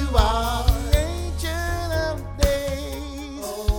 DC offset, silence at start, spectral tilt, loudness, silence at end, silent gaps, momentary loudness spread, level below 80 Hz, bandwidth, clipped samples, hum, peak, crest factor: under 0.1%; 0 s; -5 dB/octave; -24 LUFS; 0 s; none; 11 LU; -24 dBFS; 20 kHz; under 0.1%; none; -2 dBFS; 20 dB